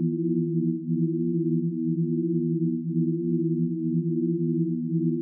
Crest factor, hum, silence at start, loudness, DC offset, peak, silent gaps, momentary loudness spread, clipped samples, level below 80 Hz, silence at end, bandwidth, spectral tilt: 10 dB; none; 0 s; -26 LUFS; under 0.1%; -14 dBFS; none; 1 LU; under 0.1%; under -90 dBFS; 0 s; 0.4 kHz; -18 dB/octave